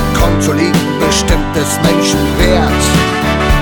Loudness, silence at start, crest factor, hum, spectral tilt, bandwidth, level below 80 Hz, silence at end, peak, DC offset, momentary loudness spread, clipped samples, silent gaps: -12 LUFS; 0 s; 10 dB; none; -4.5 dB/octave; 19.5 kHz; -18 dBFS; 0 s; 0 dBFS; under 0.1%; 2 LU; under 0.1%; none